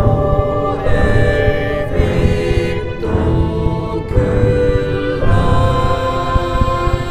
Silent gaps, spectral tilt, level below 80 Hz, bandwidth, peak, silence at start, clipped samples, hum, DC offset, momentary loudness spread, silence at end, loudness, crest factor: none; -7.5 dB/octave; -20 dBFS; 10 kHz; 0 dBFS; 0 s; under 0.1%; none; under 0.1%; 4 LU; 0 s; -16 LUFS; 14 dB